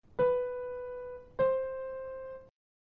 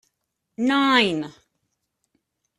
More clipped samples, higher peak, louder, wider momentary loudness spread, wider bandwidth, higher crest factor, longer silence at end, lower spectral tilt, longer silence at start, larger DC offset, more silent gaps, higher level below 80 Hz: neither; second, -20 dBFS vs -4 dBFS; second, -34 LUFS vs -20 LUFS; about the same, 14 LU vs 14 LU; second, 4 kHz vs 12 kHz; second, 16 dB vs 22 dB; second, 0.4 s vs 1.25 s; about the same, -5 dB/octave vs -4.5 dB/octave; second, 0.2 s vs 0.6 s; neither; neither; first, -62 dBFS vs -68 dBFS